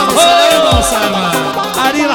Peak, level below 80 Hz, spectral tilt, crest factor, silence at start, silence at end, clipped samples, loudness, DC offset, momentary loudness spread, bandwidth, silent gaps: 0 dBFS; -28 dBFS; -3 dB/octave; 10 dB; 0 s; 0 s; 0.4%; -10 LUFS; under 0.1%; 7 LU; over 20 kHz; none